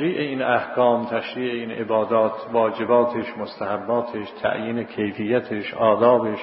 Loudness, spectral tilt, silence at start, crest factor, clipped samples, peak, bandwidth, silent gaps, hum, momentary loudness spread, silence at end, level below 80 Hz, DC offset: -22 LUFS; -10.5 dB/octave; 0 s; 18 dB; under 0.1%; -4 dBFS; 5.8 kHz; none; none; 10 LU; 0 s; -64 dBFS; under 0.1%